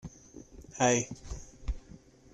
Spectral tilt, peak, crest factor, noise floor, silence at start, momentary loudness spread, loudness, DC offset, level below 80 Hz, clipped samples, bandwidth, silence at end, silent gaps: -4 dB/octave; -14 dBFS; 22 dB; -54 dBFS; 0.05 s; 24 LU; -31 LUFS; under 0.1%; -44 dBFS; under 0.1%; 11.5 kHz; 0.35 s; none